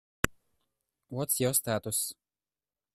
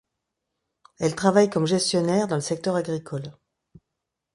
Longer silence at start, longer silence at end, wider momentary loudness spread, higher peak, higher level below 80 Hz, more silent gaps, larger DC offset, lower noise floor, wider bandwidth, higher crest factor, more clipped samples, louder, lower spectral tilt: second, 0.25 s vs 1 s; second, 0.8 s vs 1 s; second, 10 LU vs 13 LU; about the same, -4 dBFS vs -4 dBFS; first, -54 dBFS vs -64 dBFS; neither; neither; first, under -90 dBFS vs -83 dBFS; first, 15.5 kHz vs 11.5 kHz; first, 30 dB vs 22 dB; neither; second, -30 LUFS vs -23 LUFS; second, -3.5 dB/octave vs -5 dB/octave